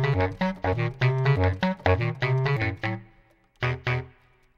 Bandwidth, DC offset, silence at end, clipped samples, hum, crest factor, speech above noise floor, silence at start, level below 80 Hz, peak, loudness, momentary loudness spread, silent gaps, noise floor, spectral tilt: 6.8 kHz; under 0.1%; 0.5 s; under 0.1%; none; 20 dB; 35 dB; 0 s; -46 dBFS; -6 dBFS; -26 LUFS; 8 LU; none; -59 dBFS; -8 dB/octave